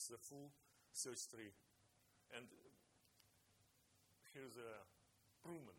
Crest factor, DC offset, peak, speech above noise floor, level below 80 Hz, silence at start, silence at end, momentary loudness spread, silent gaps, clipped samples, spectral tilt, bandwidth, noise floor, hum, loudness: 24 dB; under 0.1%; -34 dBFS; 21 dB; under -90 dBFS; 0 s; 0 s; 15 LU; none; under 0.1%; -2.5 dB/octave; 18 kHz; -78 dBFS; none; -55 LUFS